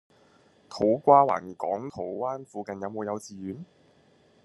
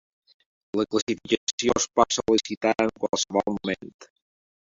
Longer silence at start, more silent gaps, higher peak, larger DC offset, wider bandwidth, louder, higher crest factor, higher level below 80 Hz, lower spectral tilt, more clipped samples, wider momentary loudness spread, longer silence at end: about the same, 0.7 s vs 0.75 s; second, none vs 1.02-1.07 s, 1.37-1.58 s, 2.57-2.61 s, 3.94-3.99 s; about the same, -4 dBFS vs -2 dBFS; neither; first, 12 kHz vs 7.8 kHz; about the same, -26 LUFS vs -25 LUFS; about the same, 24 dB vs 24 dB; second, -70 dBFS vs -58 dBFS; first, -6.5 dB/octave vs -3 dB/octave; neither; first, 19 LU vs 9 LU; first, 0.8 s vs 0.65 s